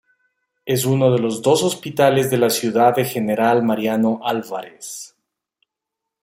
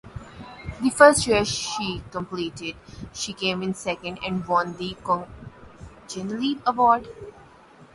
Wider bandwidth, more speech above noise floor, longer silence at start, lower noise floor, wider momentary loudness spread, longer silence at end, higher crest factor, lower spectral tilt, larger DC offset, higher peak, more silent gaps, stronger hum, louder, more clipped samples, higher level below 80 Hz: first, 16 kHz vs 11.5 kHz; first, 65 dB vs 27 dB; first, 0.65 s vs 0.05 s; first, -83 dBFS vs -50 dBFS; second, 16 LU vs 23 LU; first, 1.15 s vs 0.1 s; second, 18 dB vs 24 dB; first, -5 dB/octave vs -3.5 dB/octave; neither; about the same, -2 dBFS vs 0 dBFS; neither; neither; first, -18 LUFS vs -23 LUFS; neither; second, -62 dBFS vs -50 dBFS